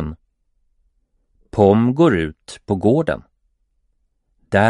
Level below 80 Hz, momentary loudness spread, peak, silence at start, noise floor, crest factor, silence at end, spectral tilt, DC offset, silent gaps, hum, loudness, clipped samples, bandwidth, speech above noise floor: -44 dBFS; 15 LU; 0 dBFS; 0 s; -66 dBFS; 20 dB; 0 s; -7.5 dB/octave; under 0.1%; none; none; -17 LUFS; under 0.1%; 11.5 kHz; 50 dB